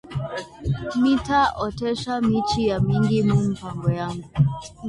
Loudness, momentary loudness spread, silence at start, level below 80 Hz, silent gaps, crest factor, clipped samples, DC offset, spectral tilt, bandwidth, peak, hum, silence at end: -23 LUFS; 9 LU; 0.05 s; -42 dBFS; none; 14 dB; under 0.1%; under 0.1%; -7 dB/octave; 11 kHz; -8 dBFS; none; 0 s